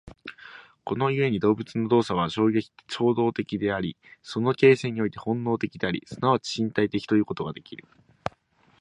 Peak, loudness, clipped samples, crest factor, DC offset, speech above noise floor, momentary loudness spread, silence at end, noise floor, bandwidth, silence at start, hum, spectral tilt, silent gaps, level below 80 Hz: -6 dBFS; -25 LUFS; under 0.1%; 20 dB; under 0.1%; 37 dB; 18 LU; 0.5 s; -62 dBFS; 10.5 kHz; 0.05 s; none; -6.5 dB/octave; none; -58 dBFS